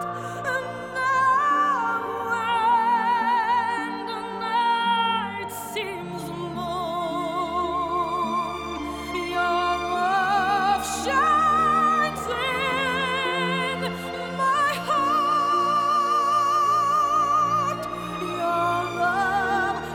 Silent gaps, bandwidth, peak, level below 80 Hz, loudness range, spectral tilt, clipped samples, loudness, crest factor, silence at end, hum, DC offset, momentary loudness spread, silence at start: none; 19 kHz; -10 dBFS; -54 dBFS; 5 LU; -4 dB/octave; under 0.1%; -23 LUFS; 14 dB; 0 s; none; under 0.1%; 10 LU; 0 s